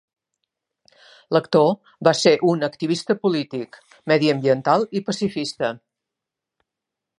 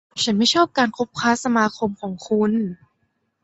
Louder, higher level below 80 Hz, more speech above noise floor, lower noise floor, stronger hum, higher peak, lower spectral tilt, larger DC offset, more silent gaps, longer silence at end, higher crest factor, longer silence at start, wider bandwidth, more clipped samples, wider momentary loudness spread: about the same, -20 LUFS vs -20 LUFS; second, -68 dBFS vs -62 dBFS; first, 65 dB vs 50 dB; first, -85 dBFS vs -70 dBFS; neither; about the same, 0 dBFS vs -2 dBFS; first, -5.5 dB/octave vs -4 dB/octave; neither; neither; first, 1.45 s vs 0.7 s; about the same, 22 dB vs 18 dB; first, 1.3 s vs 0.15 s; first, 11 kHz vs 8.2 kHz; neither; about the same, 11 LU vs 9 LU